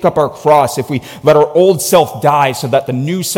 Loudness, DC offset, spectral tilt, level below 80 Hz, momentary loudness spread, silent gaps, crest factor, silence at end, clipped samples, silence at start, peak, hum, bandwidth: -12 LUFS; under 0.1%; -5 dB/octave; -50 dBFS; 7 LU; none; 12 dB; 0 s; under 0.1%; 0 s; 0 dBFS; none; 17 kHz